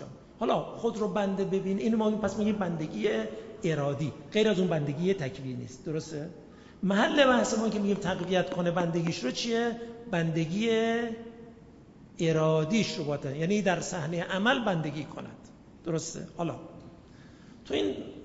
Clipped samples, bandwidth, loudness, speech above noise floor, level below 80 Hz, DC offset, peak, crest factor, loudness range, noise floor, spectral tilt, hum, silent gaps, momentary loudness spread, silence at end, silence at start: under 0.1%; 8 kHz; -29 LUFS; 23 dB; -60 dBFS; under 0.1%; -8 dBFS; 20 dB; 4 LU; -52 dBFS; -5.5 dB/octave; none; none; 13 LU; 0 s; 0 s